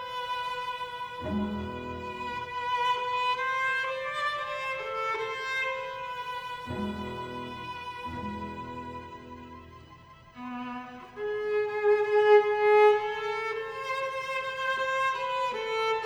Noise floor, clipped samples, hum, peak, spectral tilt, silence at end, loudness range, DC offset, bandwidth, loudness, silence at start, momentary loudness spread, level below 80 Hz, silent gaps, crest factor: -52 dBFS; under 0.1%; none; -10 dBFS; -4.5 dB/octave; 0 s; 14 LU; under 0.1%; 12.5 kHz; -29 LUFS; 0 s; 16 LU; -58 dBFS; none; 20 dB